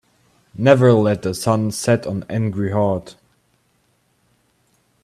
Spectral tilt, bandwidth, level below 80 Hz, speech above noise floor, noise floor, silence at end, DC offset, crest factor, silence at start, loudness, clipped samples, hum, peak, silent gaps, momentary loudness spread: -6.5 dB/octave; 13.5 kHz; -56 dBFS; 46 dB; -63 dBFS; 1.9 s; under 0.1%; 20 dB; 0.55 s; -18 LUFS; under 0.1%; none; 0 dBFS; none; 11 LU